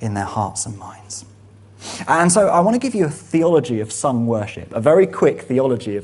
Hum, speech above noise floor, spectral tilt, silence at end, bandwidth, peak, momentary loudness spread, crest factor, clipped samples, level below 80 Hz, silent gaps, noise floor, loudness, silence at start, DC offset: none; 27 dB; -5.5 dB/octave; 0 s; 11.5 kHz; 0 dBFS; 18 LU; 18 dB; under 0.1%; -54 dBFS; none; -45 dBFS; -18 LUFS; 0 s; under 0.1%